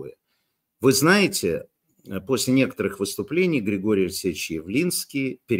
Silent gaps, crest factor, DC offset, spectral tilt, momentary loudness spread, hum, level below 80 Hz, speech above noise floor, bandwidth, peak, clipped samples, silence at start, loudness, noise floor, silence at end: none; 18 dB; under 0.1%; -4.5 dB/octave; 11 LU; none; -58 dBFS; 51 dB; 16 kHz; -4 dBFS; under 0.1%; 0 s; -22 LUFS; -74 dBFS; 0 s